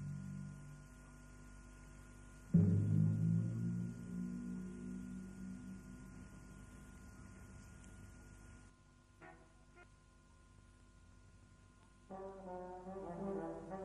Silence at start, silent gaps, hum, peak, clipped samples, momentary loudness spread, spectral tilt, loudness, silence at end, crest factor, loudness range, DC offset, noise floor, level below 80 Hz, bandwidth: 0 s; none; 50 Hz at -60 dBFS; -20 dBFS; under 0.1%; 24 LU; -9 dB/octave; -41 LUFS; 0 s; 24 dB; 23 LU; under 0.1%; -66 dBFS; -62 dBFS; 11 kHz